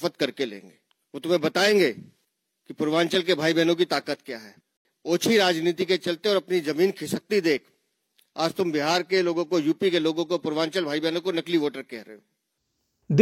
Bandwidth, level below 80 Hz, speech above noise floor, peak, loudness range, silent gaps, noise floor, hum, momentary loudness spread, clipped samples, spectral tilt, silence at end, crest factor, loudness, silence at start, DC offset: 16 kHz; -74 dBFS; 53 dB; -4 dBFS; 2 LU; 4.77-4.85 s; -77 dBFS; none; 14 LU; under 0.1%; -4.5 dB/octave; 0 s; 22 dB; -24 LUFS; 0 s; under 0.1%